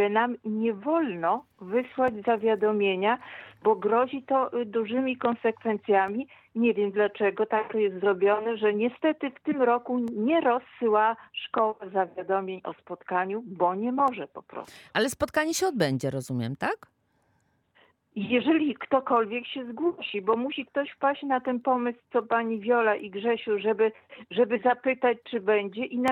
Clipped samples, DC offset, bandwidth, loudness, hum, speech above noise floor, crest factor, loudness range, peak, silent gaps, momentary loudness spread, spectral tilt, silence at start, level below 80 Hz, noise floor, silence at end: under 0.1%; under 0.1%; 17 kHz; -27 LUFS; none; 43 dB; 18 dB; 3 LU; -10 dBFS; none; 7 LU; -5 dB/octave; 0 s; -68 dBFS; -70 dBFS; 0 s